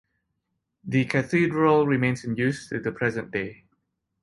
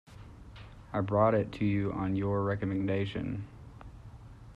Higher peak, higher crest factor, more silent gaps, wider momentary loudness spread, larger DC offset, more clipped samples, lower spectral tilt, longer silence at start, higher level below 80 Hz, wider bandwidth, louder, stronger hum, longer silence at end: first, -8 dBFS vs -14 dBFS; about the same, 18 dB vs 18 dB; neither; second, 11 LU vs 24 LU; neither; neither; second, -7 dB/octave vs -9 dB/octave; first, 0.85 s vs 0.1 s; second, -60 dBFS vs -54 dBFS; first, 11.5 kHz vs 7.2 kHz; first, -24 LUFS vs -31 LUFS; neither; first, 0.7 s vs 0.05 s